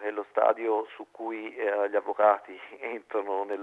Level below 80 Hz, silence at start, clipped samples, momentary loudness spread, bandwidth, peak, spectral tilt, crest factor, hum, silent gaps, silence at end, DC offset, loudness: -88 dBFS; 0 s; under 0.1%; 14 LU; 4.1 kHz; -8 dBFS; -5.5 dB/octave; 20 dB; 50 Hz at -80 dBFS; none; 0 s; under 0.1%; -28 LUFS